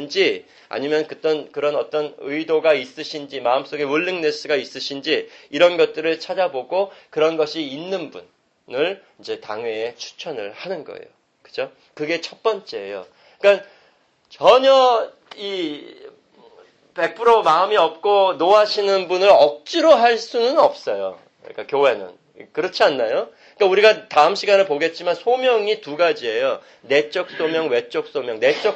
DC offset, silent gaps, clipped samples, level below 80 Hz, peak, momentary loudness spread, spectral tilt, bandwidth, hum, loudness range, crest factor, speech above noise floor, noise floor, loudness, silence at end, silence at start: under 0.1%; none; under 0.1%; -68 dBFS; -2 dBFS; 16 LU; -3.5 dB/octave; 8.4 kHz; none; 11 LU; 18 dB; 39 dB; -58 dBFS; -19 LUFS; 0 s; 0 s